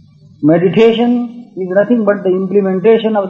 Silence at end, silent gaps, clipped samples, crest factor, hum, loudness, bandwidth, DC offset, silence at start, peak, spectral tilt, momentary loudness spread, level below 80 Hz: 0 s; none; under 0.1%; 12 dB; none; -12 LUFS; 6.8 kHz; under 0.1%; 0.4 s; 0 dBFS; -8.5 dB/octave; 7 LU; -58 dBFS